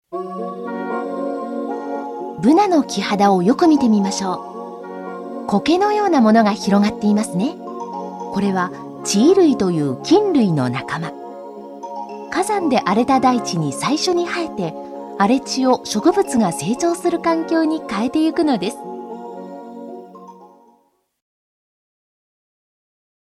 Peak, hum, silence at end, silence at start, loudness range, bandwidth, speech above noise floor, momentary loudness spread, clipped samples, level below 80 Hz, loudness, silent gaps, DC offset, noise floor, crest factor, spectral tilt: -2 dBFS; none; 2.8 s; 0.1 s; 5 LU; 13.5 kHz; 44 dB; 17 LU; under 0.1%; -58 dBFS; -18 LUFS; none; under 0.1%; -60 dBFS; 16 dB; -5.5 dB/octave